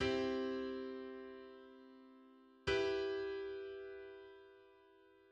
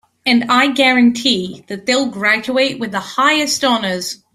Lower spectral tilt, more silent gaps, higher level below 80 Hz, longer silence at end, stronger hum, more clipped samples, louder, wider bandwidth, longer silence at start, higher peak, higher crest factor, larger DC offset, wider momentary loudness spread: first, -5 dB/octave vs -3 dB/octave; neither; second, -66 dBFS vs -58 dBFS; first, 0.55 s vs 0.2 s; neither; neither; second, -42 LUFS vs -14 LUFS; second, 8.8 kHz vs 15.5 kHz; second, 0 s vs 0.25 s; second, -26 dBFS vs 0 dBFS; about the same, 18 dB vs 14 dB; neither; first, 23 LU vs 10 LU